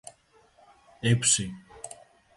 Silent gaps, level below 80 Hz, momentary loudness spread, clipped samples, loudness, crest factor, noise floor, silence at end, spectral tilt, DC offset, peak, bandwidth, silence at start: none; -58 dBFS; 21 LU; under 0.1%; -25 LUFS; 22 dB; -61 dBFS; 0.45 s; -3 dB/octave; under 0.1%; -8 dBFS; 11.5 kHz; 0.05 s